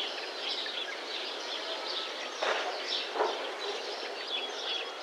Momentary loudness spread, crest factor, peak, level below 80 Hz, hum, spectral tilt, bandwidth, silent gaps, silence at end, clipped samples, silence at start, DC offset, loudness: 4 LU; 20 dB; -16 dBFS; under -90 dBFS; none; 1 dB/octave; 16 kHz; none; 0 s; under 0.1%; 0 s; under 0.1%; -34 LUFS